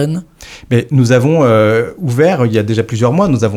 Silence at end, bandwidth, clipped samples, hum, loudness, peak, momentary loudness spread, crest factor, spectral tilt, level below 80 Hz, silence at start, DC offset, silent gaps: 0 s; 14 kHz; under 0.1%; none; -12 LUFS; 0 dBFS; 7 LU; 12 dB; -7 dB/octave; -44 dBFS; 0 s; under 0.1%; none